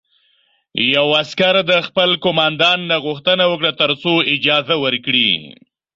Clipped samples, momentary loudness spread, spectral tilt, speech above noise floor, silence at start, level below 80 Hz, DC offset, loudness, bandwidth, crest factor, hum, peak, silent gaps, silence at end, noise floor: under 0.1%; 4 LU; -5 dB/octave; 44 dB; 0.75 s; -60 dBFS; under 0.1%; -15 LUFS; 7.6 kHz; 16 dB; none; 0 dBFS; none; 0.45 s; -60 dBFS